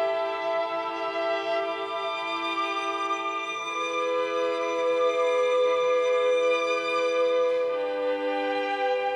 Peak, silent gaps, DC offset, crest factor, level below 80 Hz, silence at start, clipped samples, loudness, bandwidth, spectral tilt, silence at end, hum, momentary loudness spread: -14 dBFS; none; under 0.1%; 12 dB; -82 dBFS; 0 s; under 0.1%; -26 LUFS; 9 kHz; -2 dB/octave; 0 s; none; 6 LU